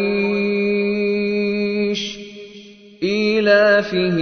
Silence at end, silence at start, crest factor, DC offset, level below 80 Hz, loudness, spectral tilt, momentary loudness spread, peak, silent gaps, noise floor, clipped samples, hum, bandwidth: 0 s; 0 s; 16 dB; under 0.1%; -56 dBFS; -18 LUFS; -6 dB/octave; 17 LU; -2 dBFS; none; -41 dBFS; under 0.1%; none; 6.6 kHz